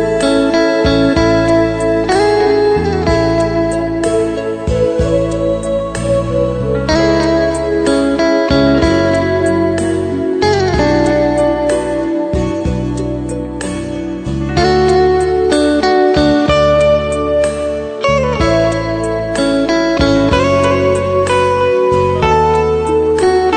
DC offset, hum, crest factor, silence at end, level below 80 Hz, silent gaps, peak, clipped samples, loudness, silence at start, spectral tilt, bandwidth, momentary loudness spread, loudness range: under 0.1%; none; 12 dB; 0 s; -28 dBFS; none; 0 dBFS; under 0.1%; -13 LUFS; 0 s; -6 dB/octave; 9.6 kHz; 6 LU; 3 LU